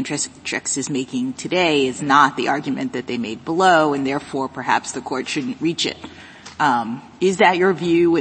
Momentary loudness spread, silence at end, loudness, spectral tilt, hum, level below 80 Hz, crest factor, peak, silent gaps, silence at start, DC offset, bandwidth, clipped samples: 11 LU; 0 s; -19 LUFS; -4 dB/octave; none; -60 dBFS; 20 dB; 0 dBFS; none; 0 s; under 0.1%; 8.8 kHz; under 0.1%